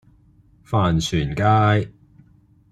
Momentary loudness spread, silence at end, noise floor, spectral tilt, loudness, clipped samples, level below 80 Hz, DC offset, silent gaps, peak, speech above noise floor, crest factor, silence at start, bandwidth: 7 LU; 0.8 s; -54 dBFS; -6 dB/octave; -20 LUFS; under 0.1%; -42 dBFS; under 0.1%; none; -4 dBFS; 36 dB; 18 dB; 0.7 s; 11.5 kHz